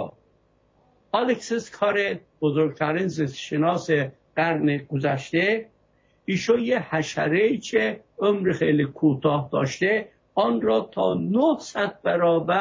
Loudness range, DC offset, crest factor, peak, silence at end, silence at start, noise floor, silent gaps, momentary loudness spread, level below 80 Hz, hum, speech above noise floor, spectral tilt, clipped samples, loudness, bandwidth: 2 LU; under 0.1%; 16 dB; -8 dBFS; 0 s; 0 s; -63 dBFS; none; 6 LU; -62 dBFS; none; 40 dB; -6 dB/octave; under 0.1%; -23 LUFS; 7.8 kHz